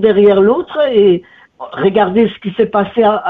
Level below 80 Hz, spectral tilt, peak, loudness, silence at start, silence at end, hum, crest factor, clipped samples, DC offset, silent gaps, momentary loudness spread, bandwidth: -48 dBFS; -9 dB/octave; 0 dBFS; -12 LUFS; 0 s; 0 s; none; 10 dB; under 0.1%; under 0.1%; none; 8 LU; 4 kHz